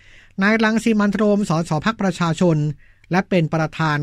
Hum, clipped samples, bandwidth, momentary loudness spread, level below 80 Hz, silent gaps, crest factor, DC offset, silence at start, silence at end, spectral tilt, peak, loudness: none; under 0.1%; 12 kHz; 5 LU; -48 dBFS; none; 14 dB; under 0.1%; 0.4 s; 0 s; -6.5 dB/octave; -4 dBFS; -19 LUFS